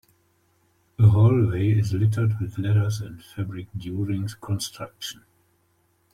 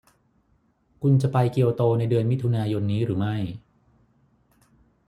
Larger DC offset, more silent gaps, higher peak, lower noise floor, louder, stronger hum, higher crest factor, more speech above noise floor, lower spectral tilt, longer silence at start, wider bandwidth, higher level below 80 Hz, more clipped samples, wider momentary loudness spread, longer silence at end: neither; neither; about the same, -6 dBFS vs -8 dBFS; about the same, -66 dBFS vs -66 dBFS; about the same, -24 LUFS vs -23 LUFS; neither; about the same, 18 dB vs 18 dB; about the same, 43 dB vs 44 dB; second, -7 dB/octave vs -9 dB/octave; about the same, 1 s vs 1 s; first, 13.5 kHz vs 11 kHz; about the same, -54 dBFS vs -58 dBFS; neither; first, 16 LU vs 8 LU; second, 1 s vs 1.5 s